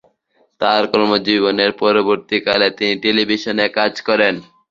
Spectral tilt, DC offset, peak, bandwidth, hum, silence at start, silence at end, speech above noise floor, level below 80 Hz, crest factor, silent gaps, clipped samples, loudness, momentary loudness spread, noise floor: -5 dB/octave; under 0.1%; 0 dBFS; 7.4 kHz; none; 0.6 s; 0.3 s; 44 dB; -56 dBFS; 16 dB; none; under 0.1%; -16 LUFS; 3 LU; -60 dBFS